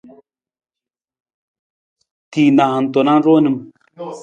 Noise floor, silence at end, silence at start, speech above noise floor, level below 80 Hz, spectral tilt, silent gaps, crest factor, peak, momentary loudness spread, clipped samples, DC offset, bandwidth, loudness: -88 dBFS; 0 s; 2.3 s; 75 dB; -66 dBFS; -7.5 dB/octave; none; 16 dB; -2 dBFS; 15 LU; under 0.1%; under 0.1%; 8 kHz; -14 LUFS